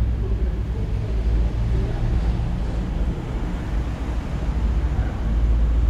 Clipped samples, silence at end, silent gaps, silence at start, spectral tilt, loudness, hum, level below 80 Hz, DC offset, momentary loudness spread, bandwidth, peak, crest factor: under 0.1%; 0 s; none; 0 s; -8 dB/octave; -25 LUFS; none; -22 dBFS; under 0.1%; 4 LU; 7.4 kHz; -10 dBFS; 12 dB